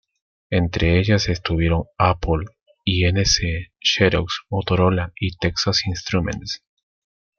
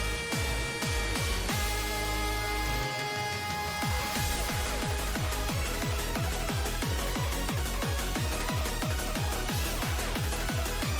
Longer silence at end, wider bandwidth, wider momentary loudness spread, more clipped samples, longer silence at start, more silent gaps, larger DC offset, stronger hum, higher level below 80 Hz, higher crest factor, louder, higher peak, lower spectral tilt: first, 0.8 s vs 0 s; second, 7.2 kHz vs over 20 kHz; first, 9 LU vs 2 LU; neither; first, 0.5 s vs 0 s; first, 2.62-2.66 s vs none; neither; neither; about the same, -36 dBFS vs -36 dBFS; first, 18 dB vs 12 dB; first, -20 LUFS vs -31 LUFS; first, -2 dBFS vs -18 dBFS; first, -5 dB/octave vs -3.5 dB/octave